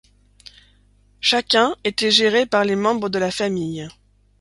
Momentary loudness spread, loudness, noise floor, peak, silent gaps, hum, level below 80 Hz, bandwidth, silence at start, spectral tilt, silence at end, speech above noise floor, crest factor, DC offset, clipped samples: 11 LU; -18 LUFS; -56 dBFS; 0 dBFS; none; 50 Hz at -45 dBFS; -56 dBFS; 11.5 kHz; 1.25 s; -3.5 dB/octave; 0.5 s; 37 dB; 20 dB; under 0.1%; under 0.1%